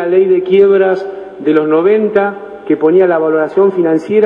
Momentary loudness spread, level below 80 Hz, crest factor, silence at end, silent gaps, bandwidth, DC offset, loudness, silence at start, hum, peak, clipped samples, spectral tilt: 9 LU; -58 dBFS; 10 dB; 0 s; none; 5.2 kHz; under 0.1%; -11 LUFS; 0 s; none; 0 dBFS; 0.1%; -8.5 dB/octave